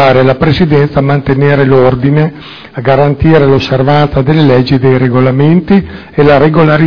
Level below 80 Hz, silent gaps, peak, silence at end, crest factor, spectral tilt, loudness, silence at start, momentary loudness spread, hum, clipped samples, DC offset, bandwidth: -30 dBFS; none; 0 dBFS; 0 s; 8 dB; -9 dB/octave; -8 LUFS; 0 s; 5 LU; none; 4%; 3%; 5.4 kHz